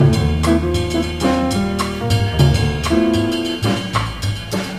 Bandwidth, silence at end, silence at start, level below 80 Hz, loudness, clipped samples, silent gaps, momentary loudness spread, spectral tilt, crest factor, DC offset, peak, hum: 15.5 kHz; 0 s; 0 s; -30 dBFS; -18 LUFS; under 0.1%; none; 6 LU; -6 dB/octave; 16 dB; 0.3%; 0 dBFS; none